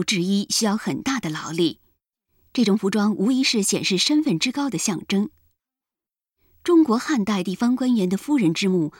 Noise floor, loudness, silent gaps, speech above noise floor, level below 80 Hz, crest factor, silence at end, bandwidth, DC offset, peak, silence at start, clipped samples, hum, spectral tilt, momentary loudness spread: under -90 dBFS; -21 LUFS; none; over 69 dB; -62 dBFS; 16 dB; 0.1 s; 17 kHz; under 0.1%; -6 dBFS; 0 s; under 0.1%; none; -4 dB/octave; 6 LU